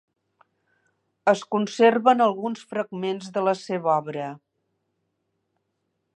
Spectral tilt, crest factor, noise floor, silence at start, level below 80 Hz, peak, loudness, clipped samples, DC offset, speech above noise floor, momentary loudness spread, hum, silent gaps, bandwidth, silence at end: -5.5 dB/octave; 22 dB; -76 dBFS; 1.25 s; -80 dBFS; -4 dBFS; -23 LUFS; under 0.1%; under 0.1%; 54 dB; 12 LU; none; none; 9.4 kHz; 1.8 s